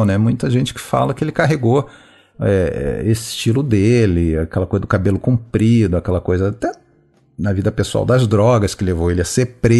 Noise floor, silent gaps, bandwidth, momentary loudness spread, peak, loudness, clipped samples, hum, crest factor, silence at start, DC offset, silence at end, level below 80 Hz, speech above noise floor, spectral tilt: -54 dBFS; none; 12.5 kHz; 6 LU; -2 dBFS; -17 LUFS; under 0.1%; none; 14 dB; 0 s; under 0.1%; 0 s; -34 dBFS; 39 dB; -6.5 dB/octave